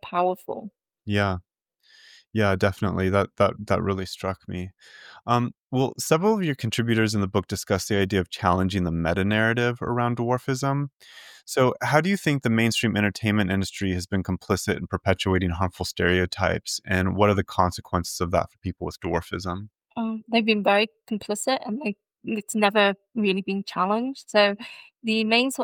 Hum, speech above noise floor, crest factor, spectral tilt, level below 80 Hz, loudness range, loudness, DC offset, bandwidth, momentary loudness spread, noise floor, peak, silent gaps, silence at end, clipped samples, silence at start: none; 36 dB; 22 dB; -5 dB/octave; -54 dBFS; 2 LU; -24 LUFS; under 0.1%; 18.5 kHz; 11 LU; -60 dBFS; -4 dBFS; 5.58-5.70 s, 10.93-11.00 s; 0 s; under 0.1%; 0.05 s